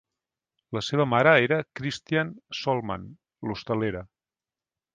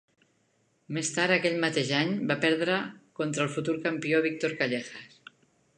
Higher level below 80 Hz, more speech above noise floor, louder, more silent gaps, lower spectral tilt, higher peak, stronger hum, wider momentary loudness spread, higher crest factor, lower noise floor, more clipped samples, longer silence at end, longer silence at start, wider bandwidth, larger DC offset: first, -58 dBFS vs -76 dBFS; first, over 65 dB vs 42 dB; about the same, -26 LUFS vs -28 LUFS; neither; first, -6 dB/octave vs -4 dB/octave; first, -4 dBFS vs -10 dBFS; neither; first, 16 LU vs 10 LU; about the same, 24 dB vs 20 dB; first, under -90 dBFS vs -70 dBFS; neither; first, 0.9 s vs 0.7 s; second, 0.7 s vs 0.9 s; about the same, 9.6 kHz vs 10.5 kHz; neither